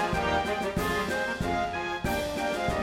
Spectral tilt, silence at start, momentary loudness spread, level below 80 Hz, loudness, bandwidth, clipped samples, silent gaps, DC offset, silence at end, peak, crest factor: -4.5 dB/octave; 0 s; 3 LU; -42 dBFS; -29 LUFS; 16.5 kHz; under 0.1%; none; under 0.1%; 0 s; -16 dBFS; 14 dB